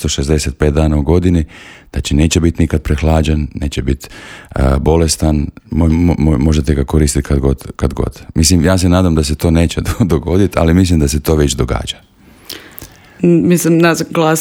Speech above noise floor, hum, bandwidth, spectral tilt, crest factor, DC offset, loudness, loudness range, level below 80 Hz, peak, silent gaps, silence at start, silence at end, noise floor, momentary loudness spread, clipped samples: 23 dB; none; 17 kHz; -5.5 dB/octave; 12 dB; under 0.1%; -13 LUFS; 3 LU; -22 dBFS; 0 dBFS; none; 0 s; 0 s; -35 dBFS; 11 LU; under 0.1%